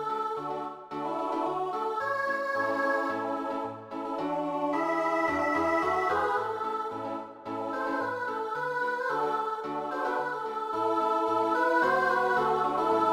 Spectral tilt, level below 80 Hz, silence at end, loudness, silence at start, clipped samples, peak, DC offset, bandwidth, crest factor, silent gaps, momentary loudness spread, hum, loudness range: -5 dB/octave; -66 dBFS; 0 s; -29 LUFS; 0 s; under 0.1%; -14 dBFS; under 0.1%; 16 kHz; 16 dB; none; 9 LU; none; 4 LU